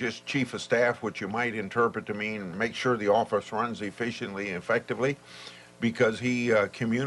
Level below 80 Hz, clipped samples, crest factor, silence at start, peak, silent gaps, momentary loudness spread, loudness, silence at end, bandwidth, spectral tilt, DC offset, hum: -66 dBFS; under 0.1%; 16 dB; 0 s; -12 dBFS; none; 8 LU; -28 LUFS; 0 s; 11.5 kHz; -5.5 dB/octave; under 0.1%; 60 Hz at -55 dBFS